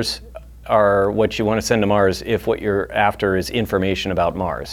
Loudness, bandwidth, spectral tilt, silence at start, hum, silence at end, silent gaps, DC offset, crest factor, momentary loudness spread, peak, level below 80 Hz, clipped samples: -19 LUFS; 17.5 kHz; -5 dB/octave; 0 s; none; 0 s; none; under 0.1%; 16 dB; 6 LU; -2 dBFS; -40 dBFS; under 0.1%